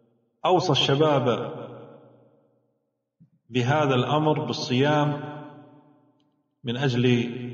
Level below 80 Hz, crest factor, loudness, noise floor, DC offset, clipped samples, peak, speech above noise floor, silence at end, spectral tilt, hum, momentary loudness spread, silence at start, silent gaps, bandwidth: -66 dBFS; 18 dB; -23 LUFS; -76 dBFS; under 0.1%; under 0.1%; -8 dBFS; 54 dB; 0 s; -4.5 dB/octave; none; 18 LU; 0.45 s; none; 7.6 kHz